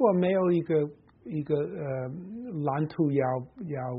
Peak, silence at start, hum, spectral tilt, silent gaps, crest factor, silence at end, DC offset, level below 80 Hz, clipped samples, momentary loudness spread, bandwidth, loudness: -10 dBFS; 0 s; none; -8 dB/octave; none; 18 dB; 0 s; under 0.1%; -66 dBFS; under 0.1%; 13 LU; 5.2 kHz; -29 LUFS